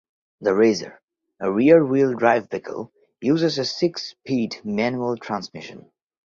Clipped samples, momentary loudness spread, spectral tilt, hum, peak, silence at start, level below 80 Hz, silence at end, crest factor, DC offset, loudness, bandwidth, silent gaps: under 0.1%; 19 LU; -6 dB/octave; none; -2 dBFS; 0.4 s; -64 dBFS; 0.5 s; 20 dB; under 0.1%; -21 LUFS; 7.6 kHz; 1.04-1.08 s